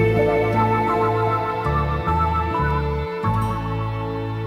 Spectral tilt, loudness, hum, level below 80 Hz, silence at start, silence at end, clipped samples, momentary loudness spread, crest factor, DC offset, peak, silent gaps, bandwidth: -8 dB/octave; -21 LUFS; none; -32 dBFS; 0 s; 0 s; under 0.1%; 7 LU; 14 dB; under 0.1%; -6 dBFS; none; 14.5 kHz